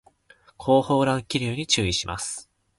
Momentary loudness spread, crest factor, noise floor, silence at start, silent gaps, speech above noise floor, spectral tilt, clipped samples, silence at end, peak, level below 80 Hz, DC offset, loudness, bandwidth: 12 LU; 18 dB; -57 dBFS; 0.6 s; none; 34 dB; -4 dB/octave; under 0.1%; 0.35 s; -6 dBFS; -48 dBFS; under 0.1%; -23 LUFS; 11.5 kHz